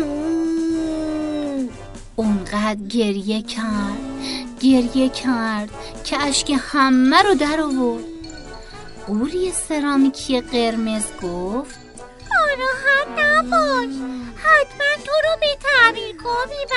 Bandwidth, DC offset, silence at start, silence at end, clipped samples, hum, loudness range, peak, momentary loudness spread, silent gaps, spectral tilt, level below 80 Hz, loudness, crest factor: 11.5 kHz; under 0.1%; 0 s; 0 s; under 0.1%; none; 5 LU; 0 dBFS; 15 LU; none; -3.5 dB/octave; -42 dBFS; -19 LUFS; 20 dB